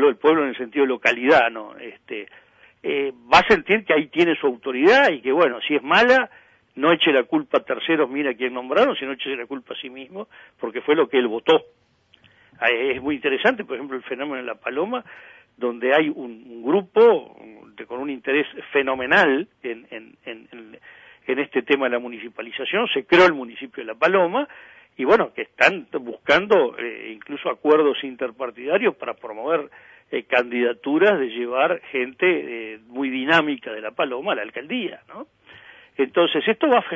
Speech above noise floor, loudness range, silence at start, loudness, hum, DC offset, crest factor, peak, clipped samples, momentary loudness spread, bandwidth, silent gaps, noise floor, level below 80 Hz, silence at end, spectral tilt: 36 dB; 6 LU; 0 s; -20 LUFS; none; under 0.1%; 20 dB; -2 dBFS; under 0.1%; 17 LU; 7.8 kHz; none; -57 dBFS; -60 dBFS; 0 s; -5 dB/octave